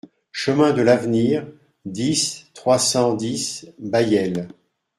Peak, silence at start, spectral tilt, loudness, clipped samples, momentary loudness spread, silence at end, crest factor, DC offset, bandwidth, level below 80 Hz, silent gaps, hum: -2 dBFS; 0.35 s; -4.5 dB/octave; -20 LUFS; under 0.1%; 15 LU; 0.5 s; 18 dB; under 0.1%; 15.5 kHz; -58 dBFS; none; none